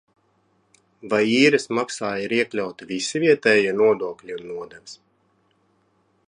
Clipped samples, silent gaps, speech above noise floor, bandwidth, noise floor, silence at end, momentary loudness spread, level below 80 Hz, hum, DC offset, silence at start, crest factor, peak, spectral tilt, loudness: under 0.1%; none; 44 dB; 11 kHz; -65 dBFS; 1.35 s; 18 LU; -68 dBFS; none; under 0.1%; 1.05 s; 20 dB; -4 dBFS; -4 dB/octave; -21 LUFS